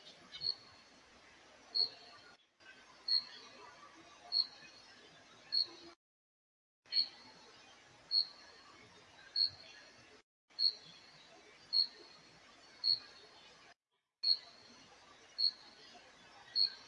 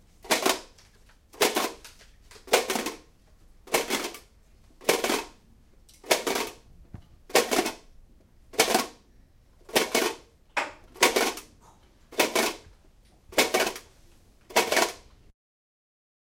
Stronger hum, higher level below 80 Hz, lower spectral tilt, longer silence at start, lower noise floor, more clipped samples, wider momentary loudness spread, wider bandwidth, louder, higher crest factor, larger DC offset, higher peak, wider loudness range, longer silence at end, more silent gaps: neither; second, -86 dBFS vs -58 dBFS; about the same, -0.5 dB/octave vs -1 dB/octave; second, 0.05 s vs 0.25 s; first, -87 dBFS vs -57 dBFS; neither; first, 25 LU vs 14 LU; second, 11.5 kHz vs 17 kHz; second, -35 LUFS vs -26 LUFS; about the same, 22 dB vs 26 dB; neither; second, -20 dBFS vs -4 dBFS; about the same, 3 LU vs 3 LU; second, 0.05 s vs 1.3 s; first, 5.96-6.83 s, 10.23-10.48 s, 13.76-13.80 s vs none